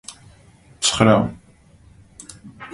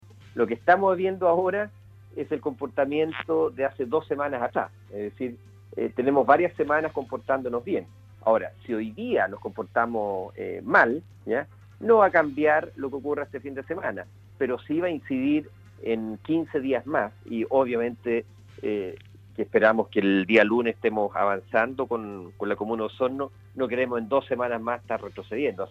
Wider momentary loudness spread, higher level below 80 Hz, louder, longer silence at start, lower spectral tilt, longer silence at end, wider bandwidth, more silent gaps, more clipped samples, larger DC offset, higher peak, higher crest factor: first, 25 LU vs 14 LU; first, -48 dBFS vs -64 dBFS; first, -18 LUFS vs -26 LUFS; second, 0.1 s vs 0.35 s; second, -4 dB/octave vs -7.5 dB/octave; about the same, 0.05 s vs 0 s; first, 11.5 kHz vs 7.4 kHz; neither; neither; neither; first, 0 dBFS vs -4 dBFS; about the same, 22 dB vs 22 dB